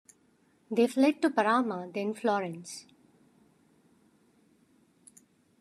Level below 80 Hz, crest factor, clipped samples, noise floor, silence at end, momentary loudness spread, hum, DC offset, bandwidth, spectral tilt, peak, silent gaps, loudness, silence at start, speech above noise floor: -86 dBFS; 22 dB; under 0.1%; -67 dBFS; 2.8 s; 16 LU; none; under 0.1%; 13 kHz; -5 dB/octave; -10 dBFS; none; -28 LUFS; 0.7 s; 39 dB